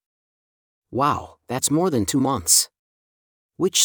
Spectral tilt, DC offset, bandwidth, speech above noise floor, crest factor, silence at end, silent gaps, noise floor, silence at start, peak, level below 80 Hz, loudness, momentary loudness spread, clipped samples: -3 dB/octave; under 0.1%; over 20 kHz; over 70 dB; 20 dB; 0 s; 2.79-3.49 s; under -90 dBFS; 0.9 s; -2 dBFS; -58 dBFS; -20 LUFS; 13 LU; under 0.1%